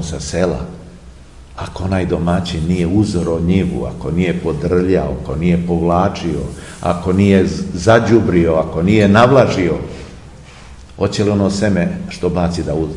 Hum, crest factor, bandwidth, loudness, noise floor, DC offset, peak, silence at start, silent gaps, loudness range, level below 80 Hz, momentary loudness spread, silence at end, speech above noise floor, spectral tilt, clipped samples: none; 16 dB; 11 kHz; -15 LUFS; -37 dBFS; 0.3%; 0 dBFS; 0 s; none; 6 LU; -34 dBFS; 12 LU; 0 s; 23 dB; -7 dB/octave; under 0.1%